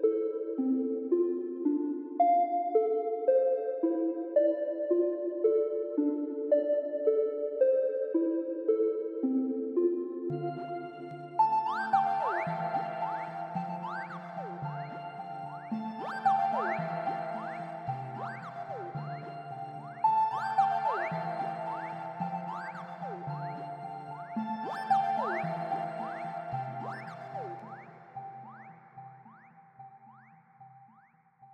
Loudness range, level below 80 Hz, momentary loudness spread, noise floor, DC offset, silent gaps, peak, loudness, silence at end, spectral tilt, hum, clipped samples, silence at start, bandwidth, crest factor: 10 LU; -82 dBFS; 14 LU; -63 dBFS; under 0.1%; none; -14 dBFS; -32 LUFS; 0 s; -8.5 dB/octave; none; under 0.1%; 0 s; 8.8 kHz; 18 dB